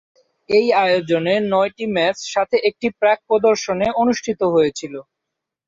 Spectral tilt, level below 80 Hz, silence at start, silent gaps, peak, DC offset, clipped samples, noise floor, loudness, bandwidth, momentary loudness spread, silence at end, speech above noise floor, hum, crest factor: -4.5 dB/octave; -58 dBFS; 0.5 s; none; -4 dBFS; under 0.1%; under 0.1%; -81 dBFS; -18 LUFS; 7.8 kHz; 5 LU; 0.65 s; 64 dB; none; 14 dB